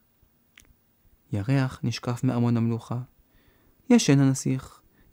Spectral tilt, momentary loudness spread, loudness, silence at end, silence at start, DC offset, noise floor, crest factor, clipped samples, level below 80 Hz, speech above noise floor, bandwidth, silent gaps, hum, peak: -6 dB/octave; 14 LU; -25 LUFS; 0.45 s; 1.3 s; under 0.1%; -64 dBFS; 18 dB; under 0.1%; -62 dBFS; 41 dB; 16 kHz; none; none; -8 dBFS